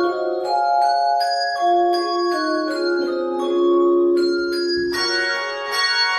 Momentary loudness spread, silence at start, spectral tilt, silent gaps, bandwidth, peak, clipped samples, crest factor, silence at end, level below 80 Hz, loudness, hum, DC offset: 5 LU; 0 s; -2.5 dB/octave; none; 12.5 kHz; -8 dBFS; under 0.1%; 12 dB; 0 s; -58 dBFS; -19 LUFS; none; under 0.1%